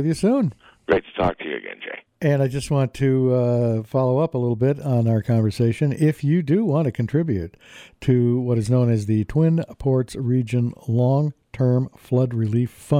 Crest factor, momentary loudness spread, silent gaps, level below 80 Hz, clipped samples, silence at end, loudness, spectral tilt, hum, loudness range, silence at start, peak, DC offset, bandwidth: 14 dB; 6 LU; none; -48 dBFS; under 0.1%; 0 s; -21 LUFS; -8.5 dB/octave; none; 2 LU; 0 s; -6 dBFS; under 0.1%; 11.5 kHz